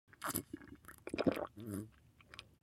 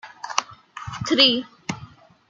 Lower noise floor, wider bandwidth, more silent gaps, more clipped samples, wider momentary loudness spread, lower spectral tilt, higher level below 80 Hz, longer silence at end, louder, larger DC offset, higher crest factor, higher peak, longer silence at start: first, -62 dBFS vs -46 dBFS; first, 16.5 kHz vs 11.5 kHz; neither; neither; second, 18 LU vs 21 LU; first, -4.5 dB/octave vs -3 dB/octave; second, -68 dBFS vs -58 dBFS; second, 0.2 s vs 0.45 s; second, -42 LUFS vs -20 LUFS; neither; about the same, 26 dB vs 24 dB; second, -18 dBFS vs -2 dBFS; first, 0.2 s vs 0.05 s